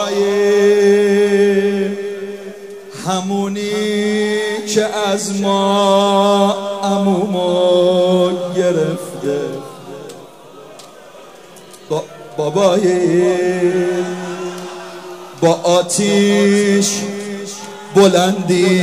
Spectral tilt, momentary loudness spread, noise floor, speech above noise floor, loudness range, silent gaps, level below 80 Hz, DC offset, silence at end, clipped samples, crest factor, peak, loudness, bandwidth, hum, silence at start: -5 dB/octave; 16 LU; -38 dBFS; 25 dB; 7 LU; none; -64 dBFS; 0.3%; 0 s; under 0.1%; 16 dB; 0 dBFS; -15 LUFS; 15.5 kHz; none; 0 s